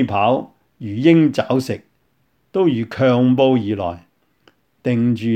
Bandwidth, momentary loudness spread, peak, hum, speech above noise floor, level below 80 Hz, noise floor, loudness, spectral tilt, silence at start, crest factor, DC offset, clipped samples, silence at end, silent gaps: 13 kHz; 14 LU; -2 dBFS; none; 48 dB; -58 dBFS; -64 dBFS; -17 LUFS; -8 dB/octave; 0 s; 16 dB; under 0.1%; under 0.1%; 0 s; none